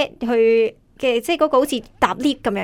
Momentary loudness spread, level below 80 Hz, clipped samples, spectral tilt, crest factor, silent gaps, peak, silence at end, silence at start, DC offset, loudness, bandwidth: 7 LU; -50 dBFS; under 0.1%; -4.5 dB/octave; 18 dB; none; -2 dBFS; 0 s; 0 s; under 0.1%; -19 LUFS; 16 kHz